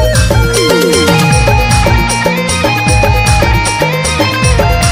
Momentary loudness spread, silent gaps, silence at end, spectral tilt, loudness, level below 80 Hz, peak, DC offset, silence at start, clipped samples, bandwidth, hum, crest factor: 3 LU; none; 0 s; -4.5 dB/octave; -9 LUFS; -16 dBFS; 0 dBFS; under 0.1%; 0 s; 0.6%; 16.5 kHz; none; 8 dB